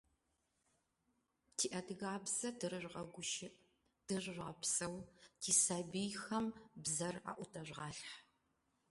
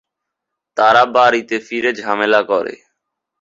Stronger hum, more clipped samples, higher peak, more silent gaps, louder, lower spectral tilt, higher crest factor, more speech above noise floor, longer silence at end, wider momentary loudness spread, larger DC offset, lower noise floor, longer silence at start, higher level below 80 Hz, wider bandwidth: neither; neither; second, -18 dBFS vs 0 dBFS; neither; second, -41 LUFS vs -14 LUFS; second, -2.5 dB/octave vs -4 dB/octave; first, 26 dB vs 16 dB; second, 41 dB vs 65 dB; about the same, 0.7 s vs 0.65 s; first, 15 LU vs 10 LU; neither; first, -84 dBFS vs -80 dBFS; first, 1.6 s vs 0.75 s; second, -76 dBFS vs -62 dBFS; first, 12 kHz vs 7.8 kHz